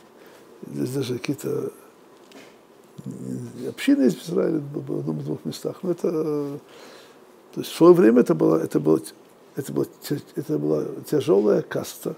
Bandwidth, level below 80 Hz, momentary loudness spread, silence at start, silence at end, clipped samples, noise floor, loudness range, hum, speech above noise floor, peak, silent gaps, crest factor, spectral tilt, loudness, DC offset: 16 kHz; -70 dBFS; 17 LU; 0.6 s; 0 s; under 0.1%; -51 dBFS; 10 LU; none; 29 dB; -2 dBFS; none; 22 dB; -6.5 dB/octave; -23 LUFS; under 0.1%